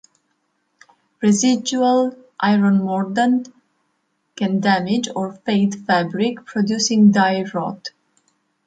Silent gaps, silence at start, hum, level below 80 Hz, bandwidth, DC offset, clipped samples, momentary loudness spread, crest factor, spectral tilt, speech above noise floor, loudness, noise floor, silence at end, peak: none; 1.2 s; none; -66 dBFS; 9.2 kHz; under 0.1%; under 0.1%; 11 LU; 16 dB; -5 dB/octave; 52 dB; -18 LUFS; -69 dBFS; 0.75 s; -4 dBFS